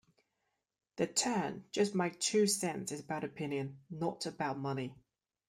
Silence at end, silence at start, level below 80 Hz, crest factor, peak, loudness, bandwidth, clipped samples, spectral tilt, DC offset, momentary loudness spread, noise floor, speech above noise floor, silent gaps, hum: 0.55 s; 0.95 s; -76 dBFS; 20 dB; -16 dBFS; -35 LUFS; 16 kHz; under 0.1%; -4 dB/octave; under 0.1%; 10 LU; -84 dBFS; 49 dB; none; none